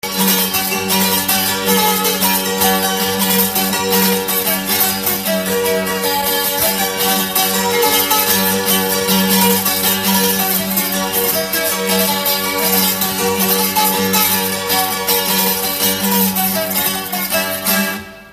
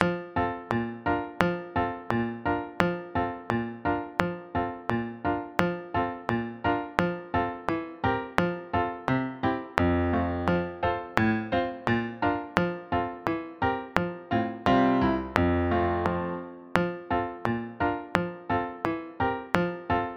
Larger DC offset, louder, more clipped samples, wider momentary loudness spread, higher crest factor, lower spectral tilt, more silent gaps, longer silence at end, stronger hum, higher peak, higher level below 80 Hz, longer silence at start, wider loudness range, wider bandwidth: neither; first, -14 LUFS vs -28 LUFS; neither; about the same, 3 LU vs 5 LU; second, 16 dB vs 28 dB; second, -2.5 dB/octave vs -7.5 dB/octave; neither; about the same, 0 s vs 0 s; neither; about the same, 0 dBFS vs 0 dBFS; about the same, -48 dBFS vs -48 dBFS; about the same, 0.05 s vs 0 s; about the same, 2 LU vs 3 LU; first, 15.5 kHz vs 10 kHz